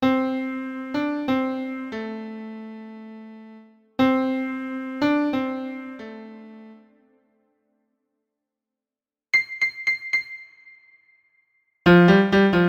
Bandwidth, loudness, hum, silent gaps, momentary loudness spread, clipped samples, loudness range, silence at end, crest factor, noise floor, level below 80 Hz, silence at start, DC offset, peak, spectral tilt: 7 kHz; -22 LUFS; none; none; 24 LU; under 0.1%; 9 LU; 0 s; 20 dB; under -90 dBFS; -56 dBFS; 0 s; under 0.1%; -4 dBFS; -7.5 dB/octave